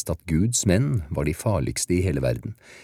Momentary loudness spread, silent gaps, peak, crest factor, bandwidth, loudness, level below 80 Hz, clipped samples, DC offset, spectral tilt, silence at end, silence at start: 6 LU; none; -6 dBFS; 18 dB; 16 kHz; -24 LUFS; -38 dBFS; under 0.1%; under 0.1%; -5.5 dB/octave; 0 s; 0 s